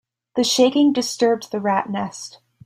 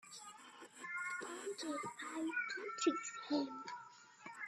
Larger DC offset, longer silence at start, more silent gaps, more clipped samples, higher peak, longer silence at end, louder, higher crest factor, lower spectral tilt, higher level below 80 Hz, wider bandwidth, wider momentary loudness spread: neither; first, 0.35 s vs 0.05 s; neither; neither; first, -4 dBFS vs -22 dBFS; first, 0.35 s vs 0 s; first, -19 LUFS vs -42 LUFS; about the same, 16 dB vs 20 dB; first, -3.5 dB/octave vs -2 dB/octave; first, -66 dBFS vs under -90 dBFS; first, 15.5 kHz vs 13 kHz; second, 14 LU vs 17 LU